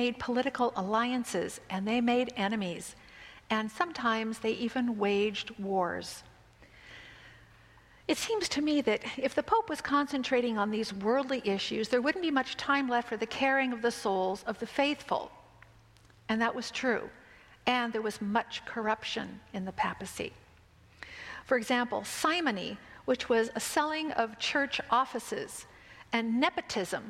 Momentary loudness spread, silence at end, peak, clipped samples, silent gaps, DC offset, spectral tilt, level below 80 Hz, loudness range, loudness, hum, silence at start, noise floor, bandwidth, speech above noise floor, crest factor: 13 LU; 0 s; -10 dBFS; under 0.1%; none; under 0.1%; -4 dB/octave; -64 dBFS; 5 LU; -31 LUFS; none; 0 s; -59 dBFS; 16 kHz; 28 dB; 22 dB